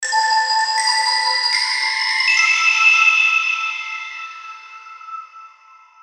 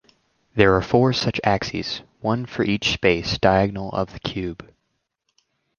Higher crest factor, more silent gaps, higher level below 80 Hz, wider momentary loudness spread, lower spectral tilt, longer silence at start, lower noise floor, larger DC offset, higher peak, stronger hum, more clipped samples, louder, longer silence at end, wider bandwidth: second, 16 dB vs 22 dB; neither; second, -70 dBFS vs -44 dBFS; first, 22 LU vs 12 LU; second, 5.5 dB/octave vs -5.5 dB/octave; second, 0 s vs 0.55 s; second, -47 dBFS vs -75 dBFS; neither; about the same, -2 dBFS vs 0 dBFS; neither; neither; first, -14 LUFS vs -21 LUFS; second, 0.55 s vs 1.15 s; first, 15.5 kHz vs 7.2 kHz